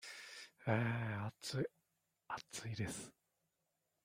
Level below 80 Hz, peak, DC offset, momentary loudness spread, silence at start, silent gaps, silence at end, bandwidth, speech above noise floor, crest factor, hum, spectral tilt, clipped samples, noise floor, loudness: -74 dBFS; -20 dBFS; under 0.1%; 13 LU; 0 s; none; 0.95 s; 16 kHz; 45 dB; 24 dB; none; -5 dB/octave; under 0.1%; -87 dBFS; -43 LUFS